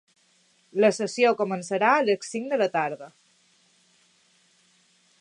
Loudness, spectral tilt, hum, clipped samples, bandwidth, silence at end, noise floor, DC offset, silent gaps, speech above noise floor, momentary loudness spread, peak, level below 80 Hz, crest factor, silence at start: -24 LUFS; -4.5 dB/octave; none; under 0.1%; 11 kHz; 2.1 s; -64 dBFS; under 0.1%; none; 40 dB; 9 LU; -6 dBFS; -82 dBFS; 20 dB; 0.75 s